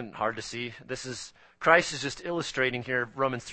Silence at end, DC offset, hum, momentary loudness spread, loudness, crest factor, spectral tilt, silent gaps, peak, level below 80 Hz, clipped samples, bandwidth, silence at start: 0 s; under 0.1%; none; 15 LU; -29 LUFS; 26 dB; -3.5 dB/octave; none; -4 dBFS; -60 dBFS; under 0.1%; 8.8 kHz; 0 s